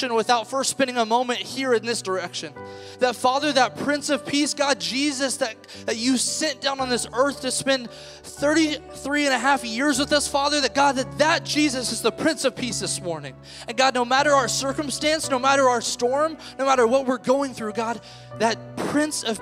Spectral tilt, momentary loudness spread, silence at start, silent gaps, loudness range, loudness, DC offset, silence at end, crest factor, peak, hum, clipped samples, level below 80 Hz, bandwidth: -2.5 dB/octave; 9 LU; 0 s; none; 3 LU; -22 LUFS; under 0.1%; 0 s; 18 dB; -4 dBFS; none; under 0.1%; -56 dBFS; 16 kHz